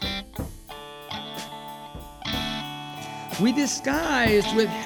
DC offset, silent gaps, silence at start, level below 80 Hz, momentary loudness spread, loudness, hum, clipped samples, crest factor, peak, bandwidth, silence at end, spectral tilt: under 0.1%; none; 0 s; -44 dBFS; 19 LU; -26 LUFS; none; under 0.1%; 18 dB; -8 dBFS; over 20 kHz; 0 s; -4 dB/octave